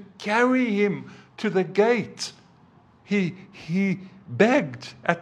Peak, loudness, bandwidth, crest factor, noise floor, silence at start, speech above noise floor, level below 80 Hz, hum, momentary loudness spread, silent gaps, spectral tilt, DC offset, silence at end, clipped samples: -2 dBFS; -24 LUFS; 11 kHz; 22 dB; -55 dBFS; 0 s; 32 dB; -72 dBFS; none; 14 LU; none; -6 dB/octave; under 0.1%; 0 s; under 0.1%